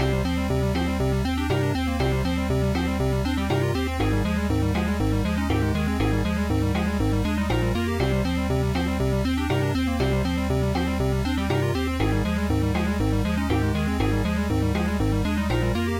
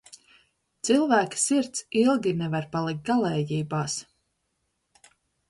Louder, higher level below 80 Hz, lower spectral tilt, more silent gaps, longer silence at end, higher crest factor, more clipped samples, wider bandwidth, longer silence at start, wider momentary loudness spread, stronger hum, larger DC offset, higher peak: about the same, -24 LUFS vs -25 LUFS; first, -32 dBFS vs -64 dBFS; first, -6.5 dB/octave vs -4.5 dB/octave; neither; second, 0 s vs 1.45 s; second, 12 dB vs 18 dB; neither; first, 16.5 kHz vs 11.5 kHz; second, 0 s vs 0.85 s; second, 1 LU vs 8 LU; neither; neither; about the same, -10 dBFS vs -8 dBFS